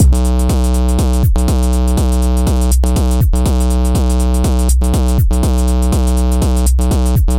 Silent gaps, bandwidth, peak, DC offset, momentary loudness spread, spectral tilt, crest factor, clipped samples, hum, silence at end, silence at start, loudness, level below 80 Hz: none; 17 kHz; -2 dBFS; under 0.1%; 1 LU; -6.5 dB/octave; 10 dB; under 0.1%; none; 0 s; 0 s; -14 LUFS; -12 dBFS